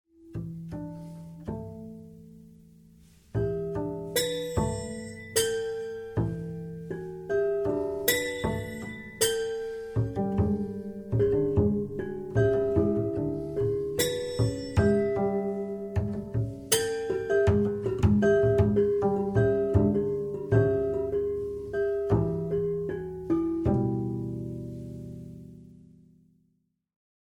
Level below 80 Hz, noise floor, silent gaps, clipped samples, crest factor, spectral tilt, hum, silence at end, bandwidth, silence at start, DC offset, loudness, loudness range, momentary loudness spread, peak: -46 dBFS; -73 dBFS; none; under 0.1%; 20 dB; -5.5 dB/octave; none; 1.6 s; 19.5 kHz; 0.2 s; under 0.1%; -28 LUFS; 9 LU; 14 LU; -8 dBFS